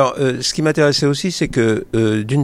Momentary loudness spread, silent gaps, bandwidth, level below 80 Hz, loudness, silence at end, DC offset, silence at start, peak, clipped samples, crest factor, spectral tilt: 4 LU; none; 14.5 kHz; -42 dBFS; -17 LUFS; 0 s; under 0.1%; 0 s; -2 dBFS; under 0.1%; 14 dB; -5 dB/octave